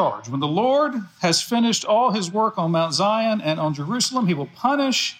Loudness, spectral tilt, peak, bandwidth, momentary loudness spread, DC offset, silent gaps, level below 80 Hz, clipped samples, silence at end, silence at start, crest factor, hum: -21 LUFS; -4 dB/octave; -8 dBFS; 16.5 kHz; 5 LU; under 0.1%; none; -72 dBFS; under 0.1%; 0.05 s; 0 s; 14 dB; none